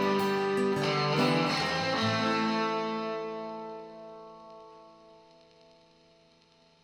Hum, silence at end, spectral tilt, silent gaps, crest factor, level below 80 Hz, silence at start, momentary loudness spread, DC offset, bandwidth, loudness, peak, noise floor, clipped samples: none; 1.9 s; -5 dB/octave; none; 16 dB; -68 dBFS; 0 s; 21 LU; under 0.1%; 17 kHz; -29 LUFS; -14 dBFS; -63 dBFS; under 0.1%